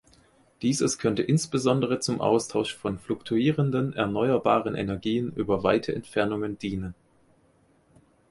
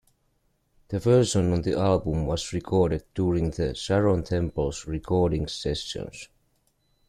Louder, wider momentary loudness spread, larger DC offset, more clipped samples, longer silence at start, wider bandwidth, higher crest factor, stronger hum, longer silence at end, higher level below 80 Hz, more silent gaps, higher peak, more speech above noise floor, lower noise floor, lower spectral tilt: about the same, -26 LUFS vs -26 LUFS; second, 7 LU vs 11 LU; neither; neither; second, 0.6 s vs 0.9 s; second, 11.5 kHz vs 13 kHz; about the same, 20 dB vs 18 dB; neither; first, 1.4 s vs 0.85 s; second, -54 dBFS vs -42 dBFS; neither; about the same, -8 dBFS vs -8 dBFS; second, 37 dB vs 45 dB; second, -63 dBFS vs -70 dBFS; about the same, -5.5 dB/octave vs -6 dB/octave